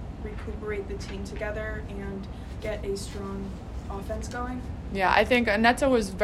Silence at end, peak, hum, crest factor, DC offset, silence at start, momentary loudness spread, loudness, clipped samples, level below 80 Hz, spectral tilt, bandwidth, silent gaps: 0 s; -6 dBFS; none; 22 dB; under 0.1%; 0 s; 16 LU; -28 LUFS; under 0.1%; -40 dBFS; -5 dB/octave; 14 kHz; none